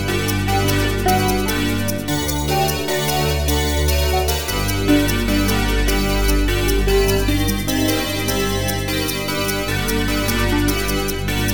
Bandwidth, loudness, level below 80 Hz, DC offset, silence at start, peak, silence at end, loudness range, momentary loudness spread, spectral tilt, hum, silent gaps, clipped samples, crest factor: 19.5 kHz; -19 LUFS; -24 dBFS; under 0.1%; 0 s; -4 dBFS; 0 s; 2 LU; 3 LU; -4.5 dB/octave; none; none; under 0.1%; 14 dB